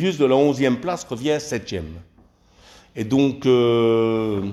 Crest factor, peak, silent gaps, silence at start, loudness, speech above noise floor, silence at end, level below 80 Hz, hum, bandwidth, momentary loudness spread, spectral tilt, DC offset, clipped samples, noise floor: 14 dB; -6 dBFS; none; 0 s; -20 LUFS; 34 dB; 0 s; -50 dBFS; none; 12.5 kHz; 14 LU; -6 dB/octave; under 0.1%; under 0.1%; -54 dBFS